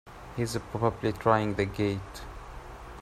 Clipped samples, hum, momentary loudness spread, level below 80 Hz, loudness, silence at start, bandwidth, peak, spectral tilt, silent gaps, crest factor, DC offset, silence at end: under 0.1%; none; 19 LU; -48 dBFS; -29 LUFS; 0.05 s; 15.5 kHz; -8 dBFS; -6.5 dB/octave; none; 22 dB; under 0.1%; 0 s